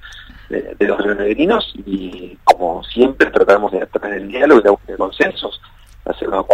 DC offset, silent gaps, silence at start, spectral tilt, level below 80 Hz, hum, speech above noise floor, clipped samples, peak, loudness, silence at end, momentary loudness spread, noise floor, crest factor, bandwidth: under 0.1%; none; 0.05 s; -5.5 dB/octave; -42 dBFS; none; 22 dB; 0.1%; 0 dBFS; -16 LUFS; 0 s; 15 LU; -37 dBFS; 16 dB; 14.5 kHz